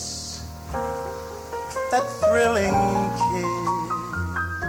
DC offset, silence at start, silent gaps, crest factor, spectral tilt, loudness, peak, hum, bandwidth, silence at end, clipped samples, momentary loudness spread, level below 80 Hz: under 0.1%; 0 s; none; 16 dB; -5 dB/octave; -24 LUFS; -8 dBFS; none; over 20 kHz; 0 s; under 0.1%; 13 LU; -42 dBFS